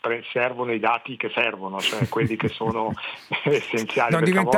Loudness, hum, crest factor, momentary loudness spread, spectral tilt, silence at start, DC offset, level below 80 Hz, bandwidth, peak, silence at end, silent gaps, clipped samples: -24 LUFS; none; 18 dB; 7 LU; -5.5 dB/octave; 0.05 s; under 0.1%; -60 dBFS; 18 kHz; -6 dBFS; 0 s; none; under 0.1%